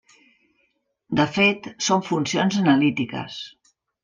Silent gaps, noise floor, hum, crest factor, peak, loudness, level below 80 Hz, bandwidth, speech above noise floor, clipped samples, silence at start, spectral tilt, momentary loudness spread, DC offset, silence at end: none; -70 dBFS; none; 18 dB; -6 dBFS; -21 LUFS; -62 dBFS; 9.6 kHz; 48 dB; under 0.1%; 1.1 s; -4.5 dB/octave; 14 LU; under 0.1%; 0.55 s